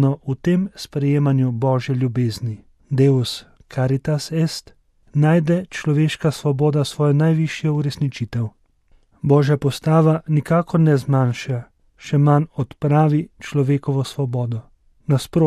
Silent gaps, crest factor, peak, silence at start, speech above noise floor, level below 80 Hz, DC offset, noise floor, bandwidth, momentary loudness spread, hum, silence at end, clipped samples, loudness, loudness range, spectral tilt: none; 16 dB; -4 dBFS; 0 s; 38 dB; -52 dBFS; under 0.1%; -56 dBFS; 13 kHz; 10 LU; none; 0 s; under 0.1%; -19 LUFS; 2 LU; -7.5 dB/octave